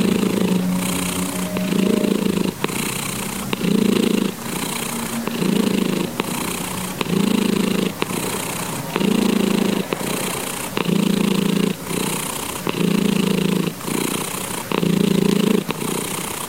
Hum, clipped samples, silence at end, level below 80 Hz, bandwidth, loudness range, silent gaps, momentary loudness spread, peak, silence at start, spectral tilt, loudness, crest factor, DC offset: none; under 0.1%; 0 s; -50 dBFS; 17 kHz; 1 LU; none; 6 LU; 0 dBFS; 0 s; -4.5 dB/octave; -20 LUFS; 20 dB; 0.4%